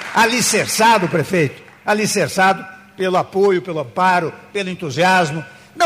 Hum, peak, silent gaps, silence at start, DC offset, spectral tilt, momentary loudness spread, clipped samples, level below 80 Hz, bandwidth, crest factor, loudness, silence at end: none; -4 dBFS; none; 0 s; under 0.1%; -3.5 dB/octave; 11 LU; under 0.1%; -60 dBFS; 15.5 kHz; 12 dB; -16 LUFS; 0 s